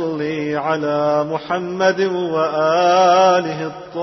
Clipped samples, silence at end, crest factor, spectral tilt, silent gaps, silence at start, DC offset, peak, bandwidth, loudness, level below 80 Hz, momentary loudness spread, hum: under 0.1%; 0 s; 14 dB; -5 dB/octave; none; 0 s; under 0.1%; -2 dBFS; 6.2 kHz; -17 LUFS; -60 dBFS; 10 LU; none